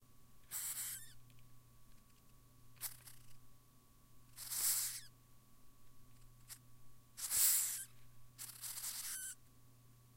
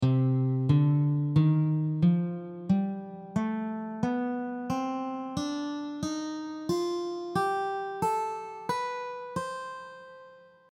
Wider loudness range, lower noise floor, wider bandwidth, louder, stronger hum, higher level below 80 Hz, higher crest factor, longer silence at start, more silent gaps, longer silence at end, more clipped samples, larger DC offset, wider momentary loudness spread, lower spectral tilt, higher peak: first, 13 LU vs 6 LU; first, -66 dBFS vs -53 dBFS; first, 16 kHz vs 12 kHz; second, -39 LUFS vs -30 LUFS; neither; second, -70 dBFS vs -62 dBFS; first, 26 dB vs 16 dB; about the same, 0 s vs 0 s; neither; second, 0 s vs 0.35 s; neither; neither; first, 25 LU vs 12 LU; second, 1 dB/octave vs -7.5 dB/octave; second, -20 dBFS vs -12 dBFS